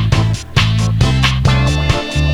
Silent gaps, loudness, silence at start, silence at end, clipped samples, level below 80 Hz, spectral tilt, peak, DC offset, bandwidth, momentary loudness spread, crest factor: none; -14 LUFS; 0 s; 0 s; under 0.1%; -20 dBFS; -5.5 dB/octave; 0 dBFS; under 0.1%; 12.5 kHz; 3 LU; 12 dB